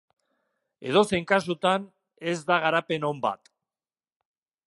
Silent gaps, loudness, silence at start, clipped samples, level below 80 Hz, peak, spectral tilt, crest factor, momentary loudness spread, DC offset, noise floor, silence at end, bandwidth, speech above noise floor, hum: none; -25 LUFS; 0.8 s; under 0.1%; -66 dBFS; -6 dBFS; -5 dB/octave; 22 dB; 10 LU; under 0.1%; under -90 dBFS; 1.3 s; 11.5 kHz; over 65 dB; none